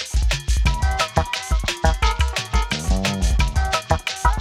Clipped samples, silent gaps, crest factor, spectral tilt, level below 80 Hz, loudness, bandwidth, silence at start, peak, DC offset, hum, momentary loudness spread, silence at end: under 0.1%; none; 18 dB; -4 dB/octave; -22 dBFS; -21 LUFS; 14 kHz; 0 s; 0 dBFS; under 0.1%; none; 2 LU; 0 s